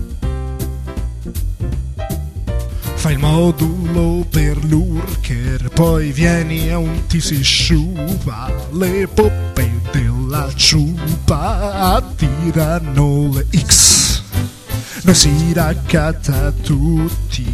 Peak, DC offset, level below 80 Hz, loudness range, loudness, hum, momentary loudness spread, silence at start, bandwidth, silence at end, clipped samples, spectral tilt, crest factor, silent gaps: 0 dBFS; 0.2%; -22 dBFS; 5 LU; -15 LUFS; none; 13 LU; 0 s; 14 kHz; 0 s; under 0.1%; -4 dB/octave; 14 dB; none